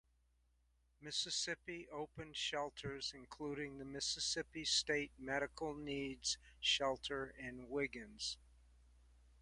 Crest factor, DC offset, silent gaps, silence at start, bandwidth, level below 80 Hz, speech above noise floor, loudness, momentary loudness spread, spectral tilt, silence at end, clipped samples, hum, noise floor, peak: 22 dB; under 0.1%; none; 1 s; 11.5 kHz; -66 dBFS; 33 dB; -42 LUFS; 12 LU; -2 dB/octave; 0 s; under 0.1%; none; -77 dBFS; -24 dBFS